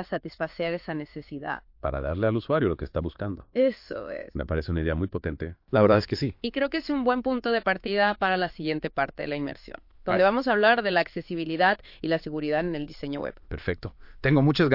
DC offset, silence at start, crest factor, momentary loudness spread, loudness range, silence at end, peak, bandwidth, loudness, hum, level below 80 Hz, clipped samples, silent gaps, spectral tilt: under 0.1%; 0 s; 20 dB; 14 LU; 4 LU; 0 s; -6 dBFS; 5.8 kHz; -27 LUFS; none; -46 dBFS; under 0.1%; none; -8 dB/octave